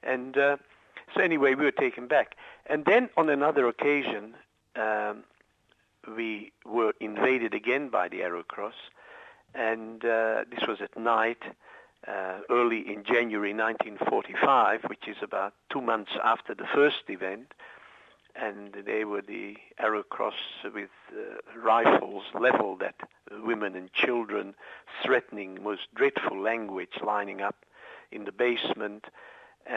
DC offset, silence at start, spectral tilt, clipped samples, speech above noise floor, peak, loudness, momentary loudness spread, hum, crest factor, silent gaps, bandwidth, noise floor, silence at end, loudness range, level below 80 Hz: under 0.1%; 0.05 s; -6 dB/octave; under 0.1%; 40 dB; -8 dBFS; -28 LUFS; 18 LU; none; 20 dB; none; 7.6 kHz; -69 dBFS; 0 s; 6 LU; -78 dBFS